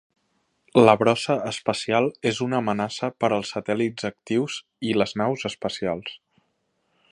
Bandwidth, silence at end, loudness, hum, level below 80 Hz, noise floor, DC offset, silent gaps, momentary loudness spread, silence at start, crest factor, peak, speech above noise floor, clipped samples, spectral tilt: 11 kHz; 0.95 s; -24 LUFS; none; -62 dBFS; -72 dBFS; under 0.1%; none; 11 LU; 0.75 s; 24 dB; 0 dBFS; 49 dB; under 0.1%; -5.5 dB/octave